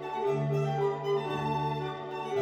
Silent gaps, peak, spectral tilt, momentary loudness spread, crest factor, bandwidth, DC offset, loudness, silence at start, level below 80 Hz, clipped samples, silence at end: none; -20 dBFS; -7.5 dB/octave; 6 LU; 12 dB; 8.6 kHz; under 0.1%; -31 LUFS; 0 s; -62 dBFS; under 0.1%; 0 s